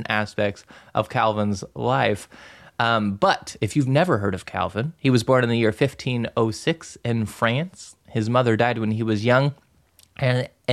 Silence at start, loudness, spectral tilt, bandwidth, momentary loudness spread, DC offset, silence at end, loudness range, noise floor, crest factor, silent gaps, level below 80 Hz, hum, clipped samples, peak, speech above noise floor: 0 s; -22 LUFS; -6 dB/octave; 13.5 kHz; 8 LU; under 0.1%; 0 s; 2 LU; -58 dBFS; 18 dB; none; -56 dBFS; none; under 0.1%; -4 dBFS; 35 dB